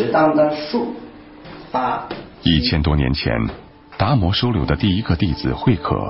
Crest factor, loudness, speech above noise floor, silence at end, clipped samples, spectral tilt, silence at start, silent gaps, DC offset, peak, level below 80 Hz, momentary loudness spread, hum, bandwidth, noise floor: 16 dB; -19 LUFS; 20 dB; 0 s; under 0.1%; -10.5 dB/octave; 0 s; none; under 0.1%; -4 dBFS; -30 dBFS; 17 LU; none; 5.8 kHz; -38 dBFS